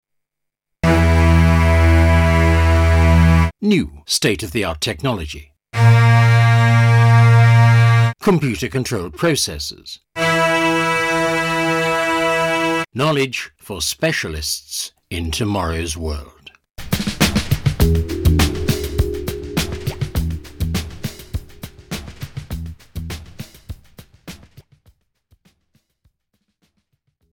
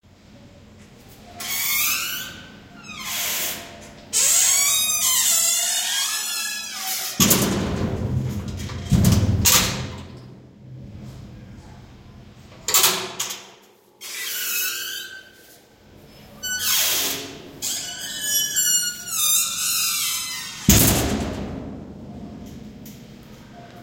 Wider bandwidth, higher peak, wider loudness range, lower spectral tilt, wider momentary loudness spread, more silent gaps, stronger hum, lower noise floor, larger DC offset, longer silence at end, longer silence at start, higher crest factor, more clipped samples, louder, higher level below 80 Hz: about the same, 17.5 kHz vs 16.5 kHz; about the same, -2 dBFS vs 0 dBFS; first, 16 LU vs 7 LU; first, -5.5 dB/octave vs -2 dB/octave; second, 19 LU vs 23 LU; neither; neither; first, -79 dBFS vs -52 dBFS; neither; first, 3 s vs 0 s; first, 0.85 s vs 0.3 s; second, 16 dB vs 24 dB; neither; first, -16 LUFS vs -20 LUFS; first, -26 dBFS vs -40 dBFS